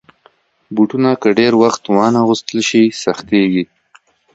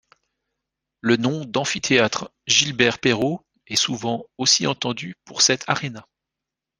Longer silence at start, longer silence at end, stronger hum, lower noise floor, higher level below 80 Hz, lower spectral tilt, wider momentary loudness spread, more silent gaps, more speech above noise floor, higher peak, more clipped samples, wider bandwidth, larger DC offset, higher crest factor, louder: second, 0.7 s vs 1.05 s; about the same, 0.7 s vs 0.8 s; neither; second, -53 dBFS vs -86 dBFS; first, -56 dBFS vs -62 dBFS; first, -5 dB/octave vs -2.5 dB/octave; second, 7 LU vs 11 LU; neither; second, 40 dB vs 64 dB; about the same, 0 dBFS vs 0 dBFS; neither; second, 8 kHz vs 10.5 kHz; neither; second, 14 dB vs 22 dB; first, -14 LUFS vs -20 LUFS